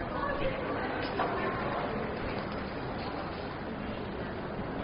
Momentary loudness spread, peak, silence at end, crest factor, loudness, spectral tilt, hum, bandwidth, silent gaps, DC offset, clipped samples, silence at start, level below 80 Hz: 5 LU; -18 dBFS; 0 s; 16 dB; -35 LUFS; -4.5 dB/octave; none; 5.2 kHz; none; under 0.1%; under 0.1%; 0 s; -48 dBFS